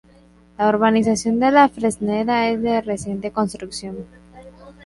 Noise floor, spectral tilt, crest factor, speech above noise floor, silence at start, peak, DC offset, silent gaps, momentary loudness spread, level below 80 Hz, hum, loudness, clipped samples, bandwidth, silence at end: -50 dBFS; -5 dB/octave; 18 dB; 32 dB; 0.6 s; -2 dBFS; under 0.1%; none; 15 LU; -50 dBFS; none; -19 LUFS; under 0.1%; 11.5 kHz; 0.15 s